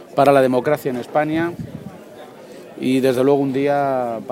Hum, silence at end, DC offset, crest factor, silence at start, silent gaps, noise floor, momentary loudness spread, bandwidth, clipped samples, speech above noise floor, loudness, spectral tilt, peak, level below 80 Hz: none; 0 s; under 0.1%; 18 dB; 0 s; none; -39 dBFS; 24 LU; 16.5 kHz; under 0.1%; 22 dB; -18 LUFS; -6.5 dB/octave; 0 dBFS; -58 dBFS